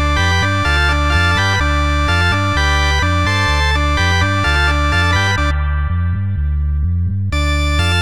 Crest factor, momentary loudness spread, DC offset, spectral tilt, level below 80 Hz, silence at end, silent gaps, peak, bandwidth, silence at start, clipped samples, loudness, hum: 14 dB; 5 LU; 3%; -4.5 dB/octave; -20 dBFS; 0 s; none; -2 dBFS; 12.5 kHz; 0 s; under 0.1%; -15 LUFS; none